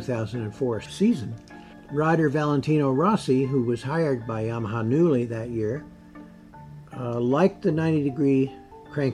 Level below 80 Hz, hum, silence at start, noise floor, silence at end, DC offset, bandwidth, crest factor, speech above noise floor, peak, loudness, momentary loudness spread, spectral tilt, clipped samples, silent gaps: -56 dBFS; none; 0 s; -45 dBFS; 0 s; under 0.1%; 11.5 kHz; 16 dB; 22 dB; -8 dBFS; -24 LUFS; 13 LU; -8 dB/octave; under 0.1%; none